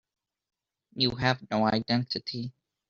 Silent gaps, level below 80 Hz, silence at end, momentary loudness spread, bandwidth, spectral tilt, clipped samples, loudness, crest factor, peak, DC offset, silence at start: none; -60 dBFS; 0.4 s; 13 LU; 7.2 kHz; -3.5 dB/octave; under 0.1%; -28 LUFS; 22 dB; -8 dBFS; under 0.1%; 0.95 s